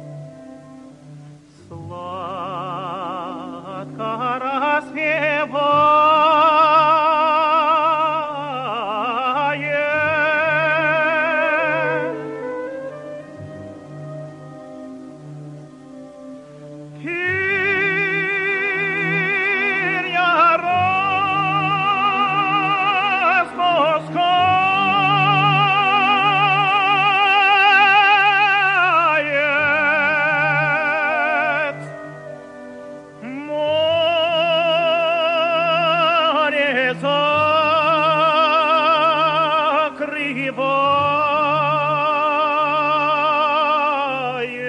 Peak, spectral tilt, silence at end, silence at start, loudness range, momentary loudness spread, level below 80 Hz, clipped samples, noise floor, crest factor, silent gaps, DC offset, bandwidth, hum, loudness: -4 dBFS; -5.5 dB/octave; 0 s; 0 s; 14 LU; 20 LU; -66 dBFS; under 0.1%; -42 dBFS; 14 dB; none; under 0.1%; 10 kHz; 60 Hz at -60 dBFS; -16 LUFS